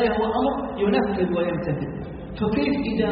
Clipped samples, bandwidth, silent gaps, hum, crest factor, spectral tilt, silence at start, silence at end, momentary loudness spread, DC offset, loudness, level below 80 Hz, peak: under 0.1%; 5.2 kHz; none; none; 16 dB; -5.5 dB/octave; 0 s; 0 s; 8 LU; under 0.1%; -24 LUFS; -42 dBFS; -8 dBFS